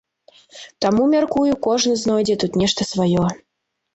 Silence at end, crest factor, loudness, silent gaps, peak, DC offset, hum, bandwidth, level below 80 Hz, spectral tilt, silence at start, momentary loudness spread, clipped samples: 0.55 s; 14 dB; -18 LUFS; none; -4 dBFS; under 0.1%; none; 8.2 kHz; -50 dBFS; -5 dB/octave; 0.55 s; 7 LU; under 0.1%